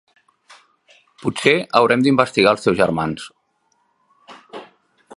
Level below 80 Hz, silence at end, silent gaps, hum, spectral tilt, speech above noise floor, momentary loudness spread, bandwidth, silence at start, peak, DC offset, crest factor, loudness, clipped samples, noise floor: -54 dBFS; 0.55 s; none; none; -5.5 dB/octave; 49 dB; 23 LU; 11.5 kHz; 1.25 s; 0 dBFS; under 0.1%; 20 dB; -17 LUFS; under 0.1%; -65 dBFS